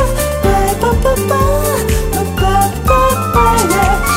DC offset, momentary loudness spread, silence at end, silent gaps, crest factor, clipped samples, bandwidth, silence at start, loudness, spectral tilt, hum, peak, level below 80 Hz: under 0.1%; 4 LU; 0 s; none; 12 dB; under 0.1%; 16.5 kHz; 0 s; -13 LUFS; -5 dB/octave; none; 0 dBFS; -18 dBFS